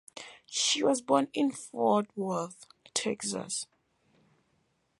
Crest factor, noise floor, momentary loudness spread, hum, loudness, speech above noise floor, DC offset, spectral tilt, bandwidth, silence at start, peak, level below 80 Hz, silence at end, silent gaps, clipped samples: 22 dB; -74 dBFS; 13 LU; none; -30 LUFS; 44 dB; under 0.1%; -3 dB/octave; 11.5 kHz; 0.15 s; -10 dBFS; -80 dBFS; 1.35 s; none; under 0.1%